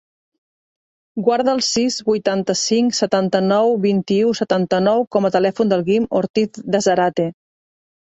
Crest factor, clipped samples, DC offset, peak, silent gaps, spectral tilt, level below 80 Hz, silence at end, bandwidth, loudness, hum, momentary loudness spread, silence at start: 16 dB; under 0.1%; under 0.1%; -2 dBFS; 5.07-5.11 s, 6.30-6.34 s; -4.5 dB/octave; -60 dBFS; 0.8 s; 8.2 kHz; -18 LUFS; none; 4 LU; 1.15 s